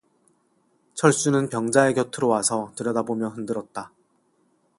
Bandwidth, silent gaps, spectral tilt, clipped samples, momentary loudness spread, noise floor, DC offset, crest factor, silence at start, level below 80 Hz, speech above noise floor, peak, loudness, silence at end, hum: 11.5 kHz; none; -4.5 dB/octave; under 0.1%; 16 LU; -66 dBFS; under 0.1%; 22 dB; 0.95 s; -66 dBFS; 44 dB; -4 dBFS; -23 LUFS; 0.9 s; none